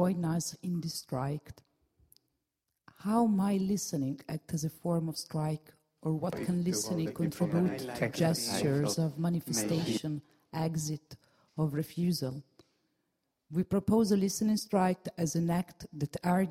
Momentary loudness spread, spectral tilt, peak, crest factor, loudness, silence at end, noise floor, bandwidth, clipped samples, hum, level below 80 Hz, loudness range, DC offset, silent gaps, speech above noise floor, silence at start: 10 LU; -5.5 dB/octave; -16 dBFS; 16 dB; -32 LUFS; 0 s; -85 dBFS; 16 kHz; under 0.1%; none; -64 dBFS; 5 LU; under 0.1%; none; 54 dB; 0 s